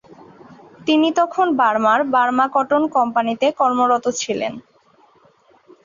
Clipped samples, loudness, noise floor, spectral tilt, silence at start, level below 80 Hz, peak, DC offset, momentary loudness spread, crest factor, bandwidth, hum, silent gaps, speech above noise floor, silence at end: under 0.1%; -18 LUFS; -54 dBFS; -3.5 dB/octave; 0.85 s; -66 dBFS; -4 dBFS; under 0.1%; 7 LU; 16 dB; 7.6 kHz; none; none; 37 dB; 1.25 s